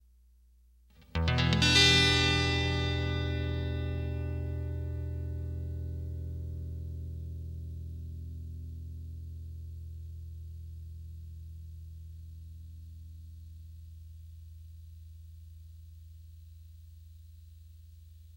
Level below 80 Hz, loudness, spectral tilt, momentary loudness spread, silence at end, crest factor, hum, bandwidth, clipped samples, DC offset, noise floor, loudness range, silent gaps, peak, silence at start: -42 dBFS; -30 LUFS; -4 dB/octave; 26 LU; 0 s; 26 dB; none; 16 kHz; under 0.1%; under 0.1%; -61 dBFS; 25 LU; none; -8 dBFS; 1 s